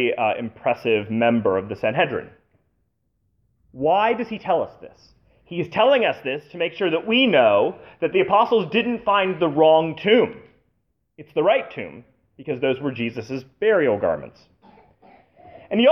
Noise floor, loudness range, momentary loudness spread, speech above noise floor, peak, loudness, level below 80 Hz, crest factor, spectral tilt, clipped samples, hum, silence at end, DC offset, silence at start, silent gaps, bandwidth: -71 dBFS; 7 LU; 13 LU; 50 dB; -4 dBFS; -21 LUFS; -62 dBFS; 18 dB; -7 dB/octave; under 0.1%; none; 0 s; under 0.1%; 0 s; none; 6.2 kHz